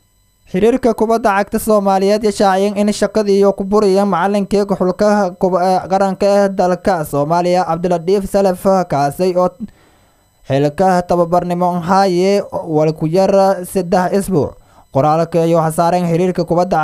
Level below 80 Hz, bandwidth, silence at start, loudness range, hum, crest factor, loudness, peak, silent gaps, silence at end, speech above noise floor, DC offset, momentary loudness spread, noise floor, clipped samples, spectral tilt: -42 dBFS; 15.5 kHz; 0.55 s; 2 LU; none; 14 dB; -14 LUFS; 0 dBFS; none; 0 s; 39 dB; under 0.1%; 4 LU; -52 dBFS; under 0.1%; -6.5 dB/octave